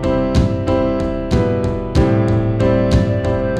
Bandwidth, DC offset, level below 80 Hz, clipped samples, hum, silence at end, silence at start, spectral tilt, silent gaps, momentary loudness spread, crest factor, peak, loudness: 9.6 kHz; under 0.1%; -24 dBFS; under 0.1%; none; 0 s; 0 s; -8 dB/octave; none; 4 LU; 14 dB; -2 dBFS; -16 LUFS